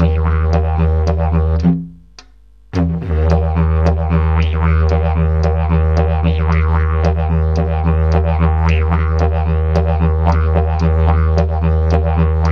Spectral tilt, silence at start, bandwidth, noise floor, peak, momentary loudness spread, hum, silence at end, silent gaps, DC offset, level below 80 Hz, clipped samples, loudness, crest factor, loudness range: -9 dB/octave; 0 s; 6.2 kHz; -45 dBFS; 0 dBFS; 2 LU; none; 0 s; none; 0.4%; -18 dBFS; under 0.1%; -15 LUFS; 14 dB; 2 LU